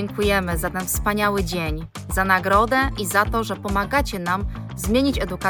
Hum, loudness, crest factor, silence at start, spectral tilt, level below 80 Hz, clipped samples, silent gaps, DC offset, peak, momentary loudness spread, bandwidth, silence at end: none; -21 LUFS; 18 dB; 0 s; -4.5 dB/octave; -32 dBFS; under 0.1%; none; under 0.1%; -4 dBFS; 8 LU; 19 kHz; 0 s